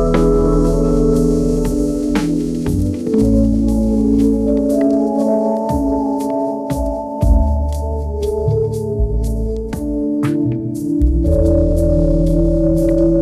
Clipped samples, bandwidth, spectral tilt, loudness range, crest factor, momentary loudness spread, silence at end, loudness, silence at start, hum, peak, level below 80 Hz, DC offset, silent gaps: under 0.1%; 14.5 kHz; -8.5 dB/octave; 4 LU; 12 dB; 7 LU; 0 s; -16 LUFS; 0 s; none; -2 dBFS; -20 dBFS; under 0.1%; none